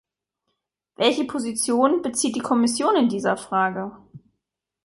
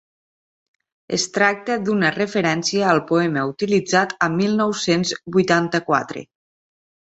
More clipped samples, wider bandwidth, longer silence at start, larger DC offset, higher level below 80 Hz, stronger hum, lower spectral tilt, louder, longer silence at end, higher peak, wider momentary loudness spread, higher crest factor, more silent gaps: neither; first, 12 kHz vs 8.2 kHz; about the same, 1 s vs 1.1 s; neither; about the same, -66 dBFS vs -62 dBFS; neither; about the same, -3.5 dB/octave vs -4.5 dB/octave; second, -22 LUFS vs -19 LUFS; second, 0.65 s vs 0.95 s; about the same, -4 dBFS vs -2 dBFS; about the same, 6 LU vs 5 LU; about the same, 18 dB vs 20 dB; neither